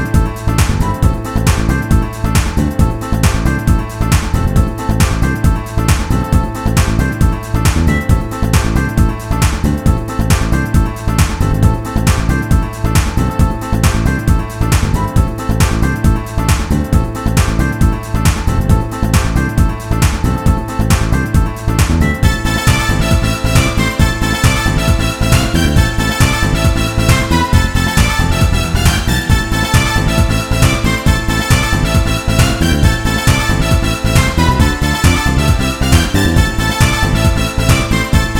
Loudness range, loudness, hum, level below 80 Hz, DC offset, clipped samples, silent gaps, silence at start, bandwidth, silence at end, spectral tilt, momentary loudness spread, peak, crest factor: 2 LU; -14 LUFS; none; -16 dBFS; 0.3%; 0.1%; none; 0 s; 19 kHz; 0 s; -5 dB/octave; 3 LU; 0 dBFS; 12 dB